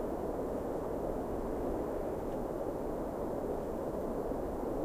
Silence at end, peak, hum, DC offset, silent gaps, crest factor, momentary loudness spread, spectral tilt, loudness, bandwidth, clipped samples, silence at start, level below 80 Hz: 0 s; -24 dBFS; none; under 0.1%; none; 12 dB; 1 LU; -8 dB/octave; -38 LUFS; 15.5 kHz; under 0.1%; 0 s; -48 dBFS